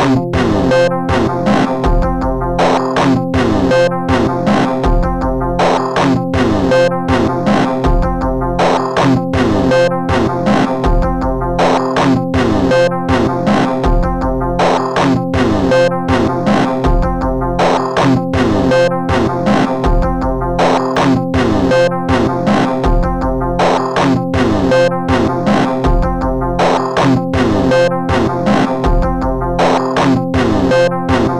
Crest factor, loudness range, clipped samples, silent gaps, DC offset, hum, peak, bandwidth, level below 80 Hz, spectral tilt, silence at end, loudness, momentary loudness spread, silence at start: 10 dB; 0 LU; under 0.1%; none; under 0.1%; none; -2 dBFS; 12 kHz; -22 dBFS; -6.5 dB/octave; 0 s; -13 LUFS; 4 LU; 0 s